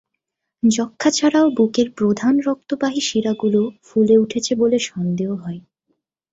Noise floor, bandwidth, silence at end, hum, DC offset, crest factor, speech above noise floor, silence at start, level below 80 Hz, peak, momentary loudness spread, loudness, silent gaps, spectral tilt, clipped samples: -78 dBFS; 8 kHz; 0.75 s; none; under 0.1%; 16 dB; 61 dB; 0.65 s; -60 dBFS; -4 dBFS; 8 LU; -18 LUFS; none; -5 dB/octave; under 0.1%